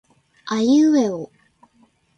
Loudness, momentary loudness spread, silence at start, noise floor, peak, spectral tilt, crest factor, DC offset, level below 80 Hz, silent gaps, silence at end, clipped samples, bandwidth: -18 LUFS; 23 LU; 0.45 s; -59 dBFS; -8 dBFS; -5 dB/octave; 14 dB; under 0.1%; -66 dBFS; none; 0.9 s; under 0.1%; 8.4 kHz